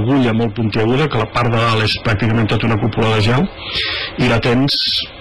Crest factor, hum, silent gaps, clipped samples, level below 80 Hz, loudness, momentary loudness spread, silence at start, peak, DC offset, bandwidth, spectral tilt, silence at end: 8 dB; none; none; under 0.1%; -36 dBFS; -15 LUFS; 4 LU; 0 s; -6 dBFS; 2%; 11.5 kHz; -6.5 dB/octave; 0 s